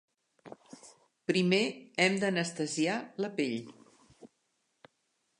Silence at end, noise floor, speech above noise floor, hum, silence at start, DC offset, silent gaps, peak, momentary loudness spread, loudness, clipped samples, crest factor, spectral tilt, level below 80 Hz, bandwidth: 1.15 s; -78 dBFS; 47 dB; none; 0.45 s; under 0.1%; none; -10 dBFS; 25 LU; -31 LUFS; under 0.1%; 24 dB; -4.5 dB/octave; -80 dBFS; 11 kHz